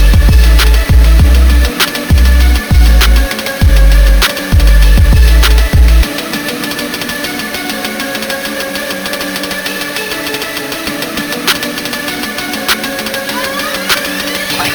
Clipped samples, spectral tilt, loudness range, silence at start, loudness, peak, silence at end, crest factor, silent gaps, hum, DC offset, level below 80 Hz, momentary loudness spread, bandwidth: 0.8%; -4 dB/octave; 7 LU; 0 s; -11 LUFS; 0 dBFS; 0 s; 10 dB; none; none; under 0.1%; -10 dBFS; 8 LU; over 20 kHz